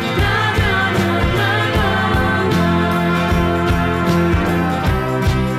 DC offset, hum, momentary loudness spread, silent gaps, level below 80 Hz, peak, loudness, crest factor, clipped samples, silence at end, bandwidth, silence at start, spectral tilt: under 0.1%; none; 2 LU; none; -26 dBFS; -6 dBFS; -16 LUFS; 10 dB; under 0.1%; 0 s; 15.5 kHz; 0 s; -6 dB/octave